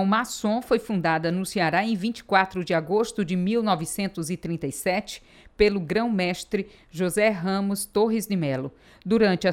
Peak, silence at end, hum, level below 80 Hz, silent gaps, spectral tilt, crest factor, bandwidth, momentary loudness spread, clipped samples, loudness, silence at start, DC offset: -6 dBFS; 0 s; none; -52 dBFS; none; -5 dB/octave; 18 dB; 16.5 kHz; 8 LU; under 0.1%; -25 LUFS; 0 s; under 0.1%